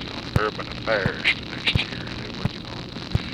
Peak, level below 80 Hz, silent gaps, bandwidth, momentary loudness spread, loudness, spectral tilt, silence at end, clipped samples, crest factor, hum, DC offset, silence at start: -6 dBFS; -40 dBFS; none; 15 kHz; 10 LU; -25 LUFS; -5.5 dB/octave; 0 s; under 0.1%; 20 dB; none; under 0.1%; 0 s